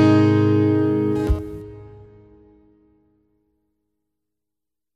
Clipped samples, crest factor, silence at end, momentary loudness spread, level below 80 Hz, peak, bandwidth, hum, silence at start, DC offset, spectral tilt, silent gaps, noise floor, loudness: under 0.1%; 18 dB; 3.1 s; 22 LU; -36 dBFS; -4 dBFS; 7.6 kHz; none; 0 s; under 0.1%; -9 dB/octave; none; -88 dBFS; -18 LUFS